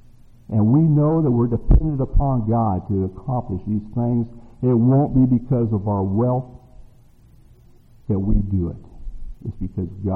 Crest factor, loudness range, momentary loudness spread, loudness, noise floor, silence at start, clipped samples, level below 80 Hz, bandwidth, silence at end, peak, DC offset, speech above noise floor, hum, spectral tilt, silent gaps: 20 dB; 8 LU; 14 LU; -20 LUFS; -49 dBFS; 0.5 s; under 0.1%; -28 dBFS; 2.4 kHz; 0 s; 0 dBFS; under 0.1%; 30 dB; none; -13.5 dB/octave; none